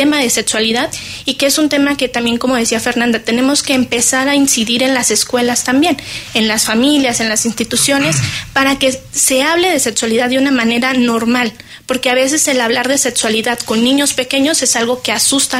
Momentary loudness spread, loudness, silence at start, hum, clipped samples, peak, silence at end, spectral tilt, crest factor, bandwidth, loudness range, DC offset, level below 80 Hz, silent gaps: 4 LU; -12 LUFS; 0 s; none; under 0.1%; 0 dBFS; 0 s; -2 dB/octave; 12 dB; 16 kHz; 1 LU; under 0.1%; -46 dBFS; none